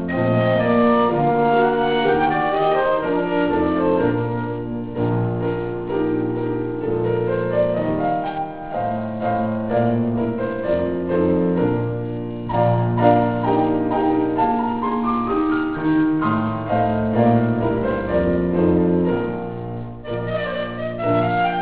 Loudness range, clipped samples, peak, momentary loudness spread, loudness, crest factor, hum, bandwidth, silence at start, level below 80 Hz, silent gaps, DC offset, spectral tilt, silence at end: 4 LU; under 0.1%; -2 dBFS; 8 LU; -20 LUFS; 18 dB; none; 4 kHz; 0 s; -42 dBFS; none; 0.7%; -11.5 dB/octave; 0 s